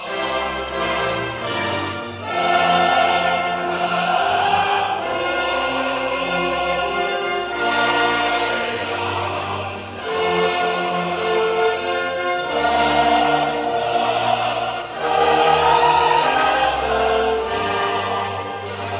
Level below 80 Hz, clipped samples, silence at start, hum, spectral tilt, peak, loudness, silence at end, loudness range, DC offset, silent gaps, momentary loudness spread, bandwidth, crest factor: -46 dBFS; under 0.1%; 0 s; none; -8 dB/octave; -2 dBFS; -19 LUFS; 0 s; 4 LU; under 0.1%; none; 8 LU; 4 kHz; 16 dB